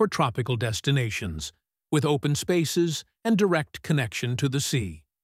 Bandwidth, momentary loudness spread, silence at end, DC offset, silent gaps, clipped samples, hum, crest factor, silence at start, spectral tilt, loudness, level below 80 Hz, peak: 16 kHz; 7 LU; 0.25 s; under 0.1%; none; under 0.1%; none; 18 dB; 0 s; -5 dB/octave; -26 LUFS; -52 dBFS; -8 dBFS